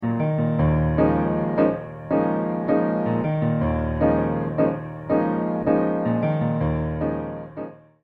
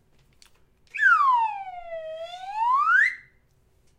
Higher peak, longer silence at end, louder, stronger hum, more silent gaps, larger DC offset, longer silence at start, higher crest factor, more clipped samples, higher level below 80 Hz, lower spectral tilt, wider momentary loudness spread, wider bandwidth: first, -6 dBFS vs -10 dBFS; second, 0.25 s vs 0.8 s; about the same, -23 LUFS vs -21 LUFS; neither; neither; neither; second, 0 s vs 0.95 s; about the same, 16 dB vs 16 dB; neither; first, -38 dBFS vs -64 dBFS; first, -11.5 dB/octave vs -0.5 dB/octave; second, 8 LU vs 18 LU; second, 4.4 kHz vs 11.5 kHz